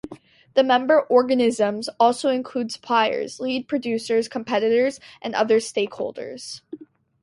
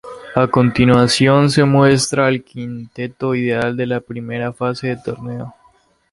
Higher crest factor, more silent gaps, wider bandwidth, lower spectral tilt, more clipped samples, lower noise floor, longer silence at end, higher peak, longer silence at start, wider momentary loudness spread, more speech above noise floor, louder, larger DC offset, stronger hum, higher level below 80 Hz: about the same, 18 dB vs 16 dB; neither; about the same, 11.5 kHz vs 11.5 kHz; second, -4 dB/octave vs -5.5 dB/octave; neither; second, -45 dBFS vs -55 dBFS; second, 0.4 s vs 0.6 s; second, -4 dBFS vs 0 dBFS; about the same, 0.05 s vs 0.05 s; about the same, 16 LU vs 16 LU; second, 24 dB vs 39 dB; second, -21 LUFS vs -16 LUFS; neither; neither; second, -68 dBFS vs -46 dBFS